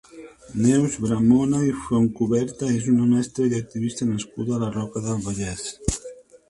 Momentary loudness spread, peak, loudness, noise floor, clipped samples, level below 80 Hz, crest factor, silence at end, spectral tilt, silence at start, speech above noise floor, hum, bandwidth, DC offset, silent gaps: 10 LU; -6 dBFS; -23 LUFS; -43 dBFS; under 0.1%; -44 dBFS; 18 dB; 0.35 s; -6.5 dB/octave; 0.15 s; 22 dB; none; 11.5 kHz; under 0.1%; none